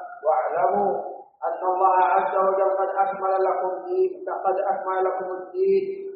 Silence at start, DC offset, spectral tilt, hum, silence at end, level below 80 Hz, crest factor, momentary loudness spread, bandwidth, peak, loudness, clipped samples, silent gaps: 0 s; under 0.1%; -5 dB/octave; none; 0 s; -78 dBFS; 16 dB; 8 LU; 4.9 kHz; -8 dBFS; -23 LUFS; under 0.1%; none